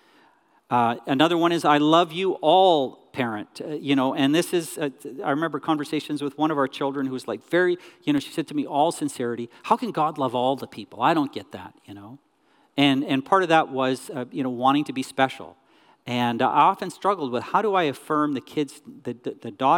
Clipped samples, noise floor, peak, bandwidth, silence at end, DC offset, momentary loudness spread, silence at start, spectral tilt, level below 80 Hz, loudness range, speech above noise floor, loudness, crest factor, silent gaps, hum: under 0.1%; -62 dBFS; -4 dBFS; 17 kHz; 0 s; under 0.1%; 14 LU; 0.7 s; -5 dB/octave; -76 dBFS; 5 LU; 39 dB; -23 LUFS; 18 dB; none; none